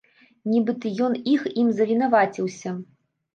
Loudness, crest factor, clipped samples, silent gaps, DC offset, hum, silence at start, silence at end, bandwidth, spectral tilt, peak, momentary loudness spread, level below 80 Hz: -23 LUFS; 16 dB; under 0.1%; none; under 0.1%; none; 0.45 s; 0.5 s; 7.2 kHz; -6.5 dB/octave; -6 dBFS; 13 LU; -76 dBFS